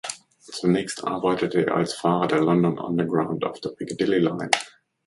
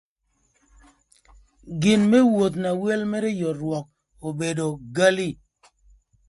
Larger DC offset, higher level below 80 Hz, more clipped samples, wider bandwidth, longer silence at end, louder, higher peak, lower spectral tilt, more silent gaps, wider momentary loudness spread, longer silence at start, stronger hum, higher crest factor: neither; second, -62 dBFS vs -56 dBFS; neither; about the same, 11.5 kHz vs 11.5 kHz; second, 0.4 s vs 0.95 s; about the same, -23 LUFS vs -22 LUFS; first, 0 dBFS vs -4 dBFS; about the same, -5.5 dB/octave vs -5.5 dB/octave; neither; second, 11 LU vs 15 LU; second, 0.05 s vs 1.65 s; neither; about the same, 24 dB vs 20 dB